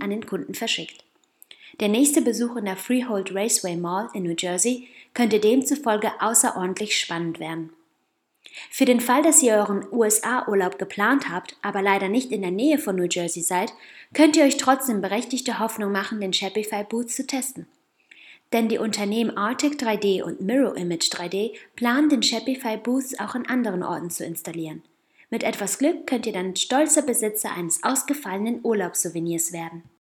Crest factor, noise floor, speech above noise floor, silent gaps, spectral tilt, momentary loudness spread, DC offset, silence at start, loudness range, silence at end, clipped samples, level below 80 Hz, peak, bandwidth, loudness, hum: 22 dB; -72 dBFS; 49 dB; none; -3 dB/octave; 11 LU; under 0.1%; 0 s; 6 LU; 0.3 s; under 0.1%; -76 dBFS; -2 dBFS; 20 kHz; -23 LUFS; none